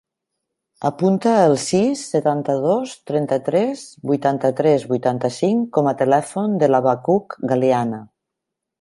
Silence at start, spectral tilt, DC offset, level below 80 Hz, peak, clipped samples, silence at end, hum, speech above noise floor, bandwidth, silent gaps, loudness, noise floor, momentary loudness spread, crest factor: 0.8 s; -6.5 dB/octave; under 0.1%; -64 dBFS; -2 dBFS; under 0.1%; 0.75 s; none; 64 dB; 11.5 kHz; none; -19 LUFS; -82 dBFS; 7 LU; 16 dB